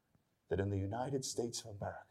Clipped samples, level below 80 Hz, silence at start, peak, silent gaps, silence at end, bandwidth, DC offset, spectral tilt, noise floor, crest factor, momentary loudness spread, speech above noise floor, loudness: under 0.1%; -68 dBFS; 0.5 s; -24 dBFS; none; 0.05 s; 14.5 kHz; under 0.1%; -5 dB/octave; -77 dBFS; 18 dB; 7 LU; 37 dB; -40 LUFS